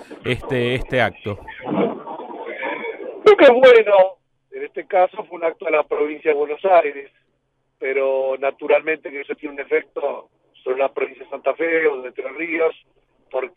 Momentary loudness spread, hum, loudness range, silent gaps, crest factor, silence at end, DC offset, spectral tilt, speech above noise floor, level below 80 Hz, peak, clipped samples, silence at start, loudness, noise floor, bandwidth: 18 LU; none; 8 LU; none; 18 dB; 0.1 s; under 0.1%; -6.5 dB/octave; 50 dB; -50 dBFS; -2 dBFS; under 0.1%; 0 s; -19 LUFS; -69 dBFS; 9.8 kHz